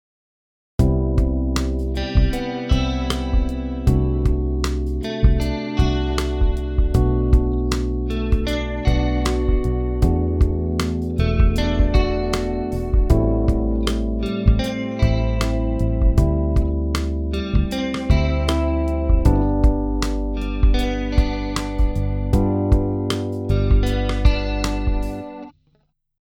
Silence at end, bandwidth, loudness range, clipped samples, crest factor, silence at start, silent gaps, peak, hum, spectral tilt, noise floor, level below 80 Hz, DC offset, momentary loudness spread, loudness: 0.7 s; 12.5 kHz; 1 LU; under 0.1%; 18 dB; 0.8 s; none; -2 dBFS; none; -7 dB/octave; -64 dBFS; -20 dBFS; under 0.1%; 5 LU; -21 LUFS